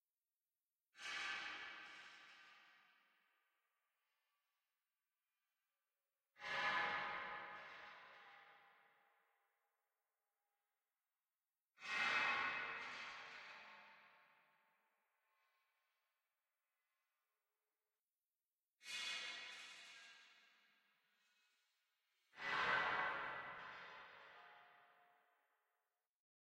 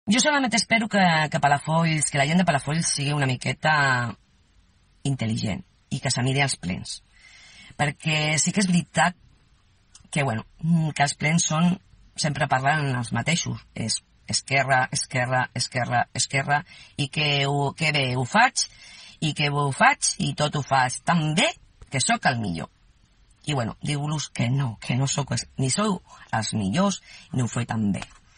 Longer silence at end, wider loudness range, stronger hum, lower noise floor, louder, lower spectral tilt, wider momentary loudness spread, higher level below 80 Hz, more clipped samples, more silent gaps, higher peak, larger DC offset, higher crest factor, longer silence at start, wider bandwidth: first, 1.7 s vs 0.3 s; first, 16 LU vs 5 LU; neither; first, under -90 dBFS vs -60 dBFS; second, -45 LUFS vs -23 LUFS; second, -1 dB/octave vs -4 dB/octave; first, 23 LU vs 11 LU; second, -88 dBFS vs -56 dBFS; neither; neither; second, -28 dBFS vs -4 dBFS; neither; about the same, 24 dB vs 20 dB; first, 0.95 s vs 0.05 s; first, 15 kHz vs 10 kHz